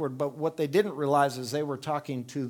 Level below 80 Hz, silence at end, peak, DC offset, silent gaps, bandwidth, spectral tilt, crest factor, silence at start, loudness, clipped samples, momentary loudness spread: -76 dBFS; 0 s; -10 dBFS; under 0.1%; none; 18.5 kHz; -6 dB/octave; 18 dB; 0 s; -29 LUFS; under 0.1%; 7 LU